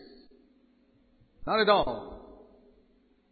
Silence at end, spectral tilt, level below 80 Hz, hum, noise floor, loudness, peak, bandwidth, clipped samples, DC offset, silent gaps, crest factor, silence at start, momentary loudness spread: 1.1 s; -8 dB/octave; -56 dBFS; none; -65 dBFS; -26 LUFS; -8 dBFS; 4.8 kHz; under 0.1%; under 0.1%; none; 24 dB; 1.4 s; 23 LU